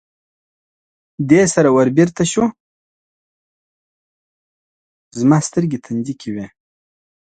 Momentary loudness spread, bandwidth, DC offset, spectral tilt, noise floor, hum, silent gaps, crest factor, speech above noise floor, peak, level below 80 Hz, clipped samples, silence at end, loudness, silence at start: 15 LU; 9.4 kHz; under 0.1%; -6 dB/octave; under -90 dBFS; none; 2.60-5.11 s; 18 dB; over 75 dB; 0 dBFS; -54 dBFS; under 0.1%; 0.9 s; -16 LUFS; 1.2 s